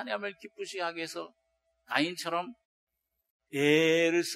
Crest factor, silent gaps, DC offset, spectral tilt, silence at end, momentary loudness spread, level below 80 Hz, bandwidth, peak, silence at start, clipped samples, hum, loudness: 22 dB; 2.65-2.87 s, 3.30-3.40 s; under 0.1%; -4 dB/octave; 0 s; 18 LU; -78 dBFS; 15.5 kHz; -10 dBFS; 0 s; under 0.1%; none; -30 LUFS